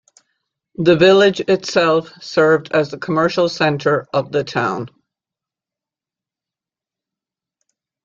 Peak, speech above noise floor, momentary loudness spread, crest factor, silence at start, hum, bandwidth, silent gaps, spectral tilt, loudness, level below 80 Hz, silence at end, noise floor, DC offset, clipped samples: 0 dBFS; 73 dB; 10 LU; 18 dB; 0.8 s; none; 7.6 kHz; none; -5.5 dB/octave; -16 LUFS; -60 dBFS; 3.15 s; -89 dBFS; under 0.1%; under 0.1%